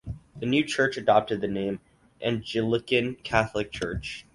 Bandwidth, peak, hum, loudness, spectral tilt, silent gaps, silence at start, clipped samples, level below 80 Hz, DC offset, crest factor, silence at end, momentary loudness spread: 11.5 kHz; -6 dBFS; none; -27 LUFS; -5.5 dB/octave; none; 0.05 s; under 0.1%; -48 dBFS; under 0.1%; 22 dB; 0.15 s; 10 LU